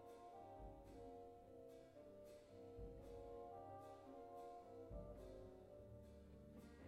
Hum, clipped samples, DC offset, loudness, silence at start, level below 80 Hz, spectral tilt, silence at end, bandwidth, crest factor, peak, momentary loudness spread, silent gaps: none; under 0.1%; under 0.1%; -60 LUFS; 0 s; -68 dBFS; -7.5 dB/octave; 0 s; 15.5 kHz; 16 dB; -44 dBFS; 6 LU; none